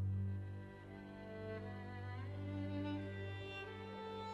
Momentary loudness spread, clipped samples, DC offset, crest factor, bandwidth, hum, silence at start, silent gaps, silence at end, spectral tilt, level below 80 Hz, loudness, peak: 9 LU; under 0.1%; under 0.1%; 12 dB; 5.8 kHz; 50 Hz at -70 dBFS; 0 s; none; 0 s; -8 dB/octave; -68 dBFS; -47 LUFS; -34 dBFS